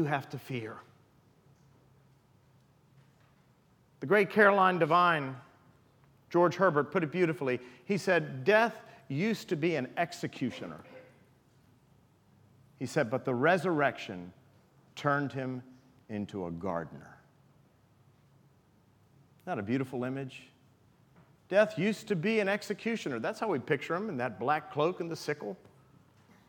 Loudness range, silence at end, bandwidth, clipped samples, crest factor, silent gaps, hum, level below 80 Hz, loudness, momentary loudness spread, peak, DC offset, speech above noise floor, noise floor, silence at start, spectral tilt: 12 LU; 0.95 s; 18.5 kHz; under 0.1%; 24 dB; none; none; -78 dBFS; -31 LUFS; 18 LU; -8 dBFS; under 0.1%; 35 dB; -65 dBFS; 0 s; -6 dB/octave